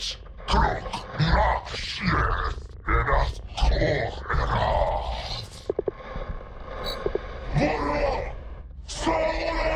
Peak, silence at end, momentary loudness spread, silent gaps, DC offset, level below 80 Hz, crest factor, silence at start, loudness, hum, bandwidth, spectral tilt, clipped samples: -10 dBFS; 0 s; 13 LU; none; under 0.1%; -30 dBFS; 16 dB; 0 s; -27 LUFS; none; 10.5 kHz; -5.5 dB/octave; under 0.1%